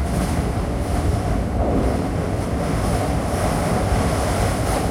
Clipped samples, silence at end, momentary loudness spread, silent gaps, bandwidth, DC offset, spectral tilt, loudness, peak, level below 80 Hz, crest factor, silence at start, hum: under 0.1%; 0 s; 3 LU; none; 16.5 kHz; under 0.1%; -6 dB/octave; -21 LUFS; -8 dBFS; -26 dBFS; 12 dB; 0 s; none